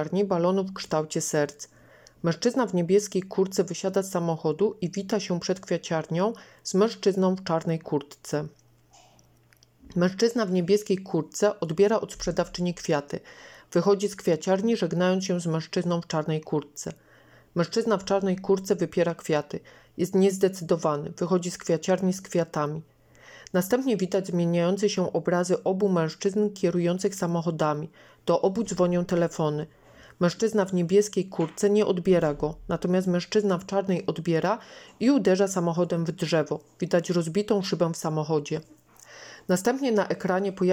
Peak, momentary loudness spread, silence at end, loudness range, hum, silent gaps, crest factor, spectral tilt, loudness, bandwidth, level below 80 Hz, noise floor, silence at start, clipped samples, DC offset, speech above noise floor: -10 dBFS; 8 LU; 0 s; 3 LU; none; none; 16 dB; -6 dB/octave; -26 LUFS; 16.5 kHz; -60 dBFS; -60 dBFS; 0 s; under 0.1%; under 0.1%; 35 dB